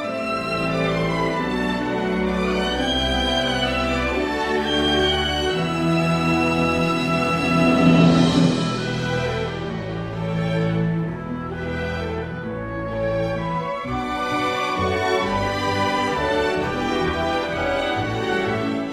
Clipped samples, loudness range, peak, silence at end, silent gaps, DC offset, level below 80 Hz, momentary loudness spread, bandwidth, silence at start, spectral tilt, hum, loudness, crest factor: under 0.1%; 7 LU; -4 dBFS; 0 s; none; under 0.1%; -38 dBFS; 9 LU; 13.5 kHz; 0 s; -5.5 dB/octave; none; -21 LUFS; 18 dB